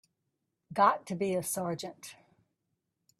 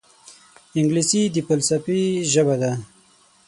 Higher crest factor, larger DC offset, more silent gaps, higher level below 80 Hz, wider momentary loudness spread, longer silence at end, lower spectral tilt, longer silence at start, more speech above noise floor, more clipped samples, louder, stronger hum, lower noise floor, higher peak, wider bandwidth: first, 24 dB vs 16 dB; neither; neither; second, -76 dBFS vs -62 dBFS; first, 19 LU vs 7 LU; first, 1.05 s vs 0.6 s; about the same, -4.5 dB/octave vs -4.5 dB/octave; first, 0.7 s vs 0.3 s; first, 52 dB vs 36 dB; neither; second, -31 LUFS vs -20 LUFS; neither; first, -83 dBFS vs -55 dBFS; second, -10 dBFS vs -4 dBFS; first, 15.5 kHz vs 11.5 kHz